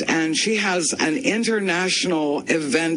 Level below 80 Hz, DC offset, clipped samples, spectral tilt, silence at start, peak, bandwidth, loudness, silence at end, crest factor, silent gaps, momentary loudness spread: -64 dBFS; under 0.1%; under 0.1%; -3 dB/octave; 0 s; -4 dBFS; 10.5 kHz; -20 LUFS; 0 s; 16 dB; none; 2 LU